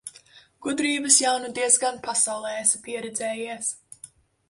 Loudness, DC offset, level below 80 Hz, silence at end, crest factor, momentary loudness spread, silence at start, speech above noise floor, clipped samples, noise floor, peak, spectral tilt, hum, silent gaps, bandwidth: -23 LUFS; under 0.1%; -70 dBFS; 0.45 s; 22 dB; 13 LU; 0.05 s; 29 dB; under 0.1%; -53 dBFS; -4 dBFS; -0.5 dB/octave; none; none; 12 kHz